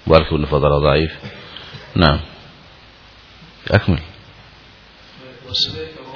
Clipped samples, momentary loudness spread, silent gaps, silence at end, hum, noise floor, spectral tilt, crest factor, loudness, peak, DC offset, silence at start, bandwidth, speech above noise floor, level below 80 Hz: under 0.1%; 20 LU; none; 0 s; none; -44 dBFS; -7 dB/octave; 20 dB; -17 LUFS; 0 dBFS; under 0.1%; 0.05 s; 5.4 kHz; 29 dB; -32 dBFS